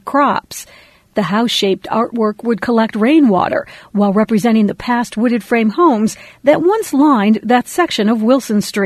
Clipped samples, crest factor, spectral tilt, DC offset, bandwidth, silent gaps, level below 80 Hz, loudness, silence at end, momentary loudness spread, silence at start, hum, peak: under 0.1%; 14 dB; -5.5 dB/octave; under 0.1%; 13.5 kHz; none; -52 dBFS; -14 LUFS; 0 s; 7 LU; 0.05 s; none; 0 dBFS